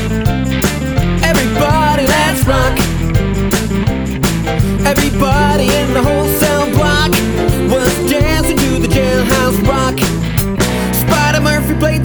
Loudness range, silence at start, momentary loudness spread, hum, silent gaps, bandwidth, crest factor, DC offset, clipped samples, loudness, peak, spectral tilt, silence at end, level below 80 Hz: 1 LU; 0 s; 4 LU; none; none; over 20 kHz; 12 dB; under 0.1%; under 0.1%; -13 LUFS; 0 dBFS; -5 dB/octave; 0 s; -22 dBFS